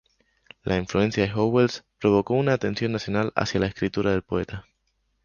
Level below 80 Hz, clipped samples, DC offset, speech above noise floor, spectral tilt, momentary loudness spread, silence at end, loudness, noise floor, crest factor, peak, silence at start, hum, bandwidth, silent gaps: -48 dBFS; under 0.1%; under 0.1%; 48 dB; -6.5 dB/octave; 8 LU; 0.65 s; -24 LUFS; -72 dBFS; 20 dB; -4 dBFS; 0.65 s; none; 7.2 kHz; none